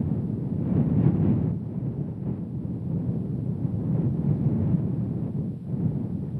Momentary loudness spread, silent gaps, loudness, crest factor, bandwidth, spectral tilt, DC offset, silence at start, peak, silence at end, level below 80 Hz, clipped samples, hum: 9 LU; none; -27 LUFS; 18 dB; 3.1 kHz; -12.5 dB/octave; under 0.1%; 0 s; -8 dBFS; 0 s; -48 dBFS; under 0.1%; none